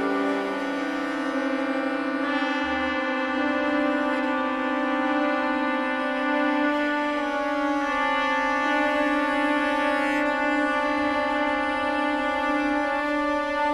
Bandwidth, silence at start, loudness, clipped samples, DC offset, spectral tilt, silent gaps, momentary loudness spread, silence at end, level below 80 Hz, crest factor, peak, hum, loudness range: 12 kHz; 0 s; -24 LUFS; under 0.1%; under 0.1%; -4 dB/octave; none; 3 LU; 0 s; -54 dBFS; 12 dB; -12 dBFS; none; 2 LU